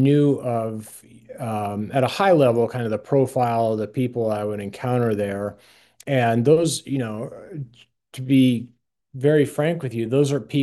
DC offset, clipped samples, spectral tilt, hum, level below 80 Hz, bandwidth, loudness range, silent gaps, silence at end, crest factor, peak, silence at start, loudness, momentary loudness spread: under 0.1%; under 0.1%; -6.5 dB/octave; none; -64 dBFS; 12.5 kHz; 2 LU; none; 0 s; 16 dB; -4 dBFS; 0 s; -21 LUFS; 18 LU